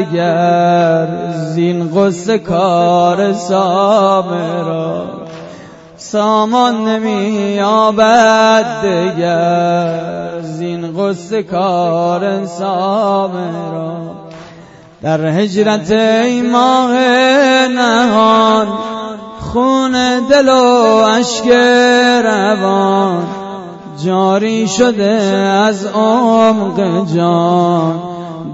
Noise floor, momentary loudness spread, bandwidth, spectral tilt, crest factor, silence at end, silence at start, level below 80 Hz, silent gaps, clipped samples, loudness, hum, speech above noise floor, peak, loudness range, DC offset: -37 dBFS; 13 LU; 8 kHz; -5 dB/octave; 12 dB; 0 s; 0 s; -50 dBFS; none; under 0.1%; -12 LUFS; none; 26 dB; 0 dBFS; 6 LU; under 0.1%